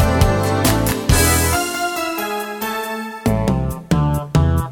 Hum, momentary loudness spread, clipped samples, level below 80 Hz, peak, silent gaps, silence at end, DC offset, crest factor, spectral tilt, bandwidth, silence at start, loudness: none; 9 LU; under 0.1%; -26 dBFS; 0 dBFS; none; 0 s; under 0.1%; 16 dB; -5 dB/octave; 19.5 kHz; 0 s; -18 LUFS